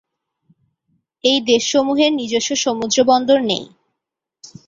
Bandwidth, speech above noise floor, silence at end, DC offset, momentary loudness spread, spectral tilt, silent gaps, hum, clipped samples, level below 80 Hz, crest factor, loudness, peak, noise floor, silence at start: 7.8 kHz; 66 dB; 1 s; under 0.1%; 6 LU; -2.5 dB/octave; none; none; under 0.1%; -60 dBFS; 18 dB; -16 LUFS; -2 dBFS; -82 dBFS; 1.25 s